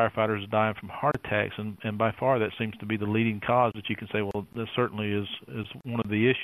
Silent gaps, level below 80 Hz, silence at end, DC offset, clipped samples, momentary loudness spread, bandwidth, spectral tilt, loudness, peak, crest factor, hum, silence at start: none; -60 dBFS; 0 s; under 0.1%; under 0.1%; 9 LU; 13.5 kHz; -8 dB/octave; -28 LUFS; -8 dBFS; 20 dB; none; 0 s